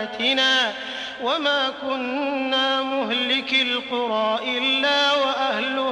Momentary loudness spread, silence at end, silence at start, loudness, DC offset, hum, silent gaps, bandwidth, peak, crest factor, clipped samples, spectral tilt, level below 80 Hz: 7 LU; 0 s; 0 s; -21 LUFS; under 0.1%; none; none; 11.5 kHz; -8 dBFS; 14 dB; under 0.1%; -2 dB/octave; -68 dBFS